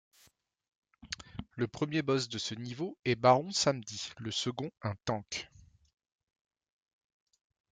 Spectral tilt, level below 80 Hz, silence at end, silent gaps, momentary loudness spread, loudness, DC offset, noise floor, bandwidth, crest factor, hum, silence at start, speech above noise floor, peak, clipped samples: -4.5 dB/octave; -66 dBFS; 2.25 s; none; 16 LU; -33 LUFS; under 0.1%; -68 dBFS; 9.6 kHz; 24 dB; none; 1.05 s; 35 dB; -12 dBFS; under 0.1%